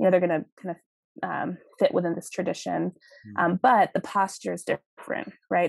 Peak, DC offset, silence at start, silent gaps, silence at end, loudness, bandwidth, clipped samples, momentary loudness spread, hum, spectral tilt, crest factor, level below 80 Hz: -8 dBFS; under 0.1%; 0 s; 0.52-0.57 s, 0.86-1.15 s, 4.86-4.97 s; 0 s; -27 LUFS; 12.5 kHz; under 0.1%; 14 LU; none; -6 dB/octave; 18 dB; -78 dBFS